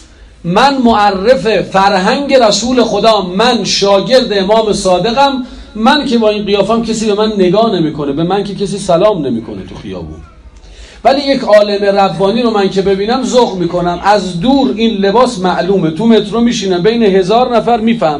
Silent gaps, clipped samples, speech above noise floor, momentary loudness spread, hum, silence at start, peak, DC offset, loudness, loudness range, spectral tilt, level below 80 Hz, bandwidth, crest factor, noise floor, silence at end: none; 1%; 24 dB; 6 LU; none; 0.2 s; 0 dBFS; under 0.1%; -10 LUFS; 4 LU; -5 dB/octave; -38 dBFS; 12 kHz; 10 dB; -34 dBFS; 0 s